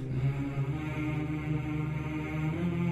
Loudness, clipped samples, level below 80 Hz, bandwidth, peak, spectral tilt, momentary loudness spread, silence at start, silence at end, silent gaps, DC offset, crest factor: -33 LUFS; under 0.1%; -48 dBFS; 8.2 kHz; -20 dBFS; -8.5 dB/octave; 2 LU; 0 s; 0 s; none; under 0.1%; 12 dB